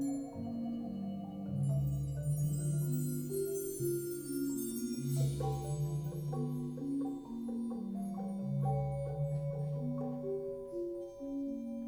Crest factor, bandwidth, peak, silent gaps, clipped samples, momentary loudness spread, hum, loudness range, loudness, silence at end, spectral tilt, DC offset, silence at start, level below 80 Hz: 12 dB; over 20 kHz; -24 dBFS; none; under 0.1%; 6 LU; none; 2 LU; -38 LUFS; 0 s; -7.5 dB/octave; under 0.1%; 0 s; -56 dBFS